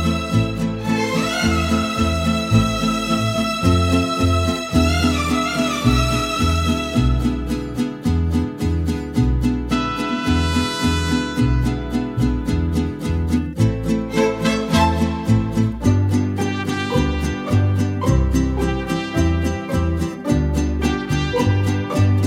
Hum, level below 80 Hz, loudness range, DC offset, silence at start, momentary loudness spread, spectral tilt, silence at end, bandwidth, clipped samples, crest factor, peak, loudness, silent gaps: none; -28 dBFS; 2 LU; under 0.1%; 0 s; 5 LU; -6 dB/octave; 0 s; 16 kHz; under 0.1%; 16 dB; -2 dBFS; -19 LUFS; none